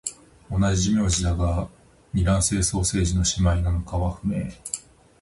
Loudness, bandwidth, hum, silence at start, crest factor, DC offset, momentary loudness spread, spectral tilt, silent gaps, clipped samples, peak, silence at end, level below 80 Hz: -24 LUFS; 11.5 kHz; none; 0.05 s; 16 dB; under 0.1%; 11 LU; -5 dB/octave; none; under 0.1%; -8 dBFS; 0.4 s; -30 dBFS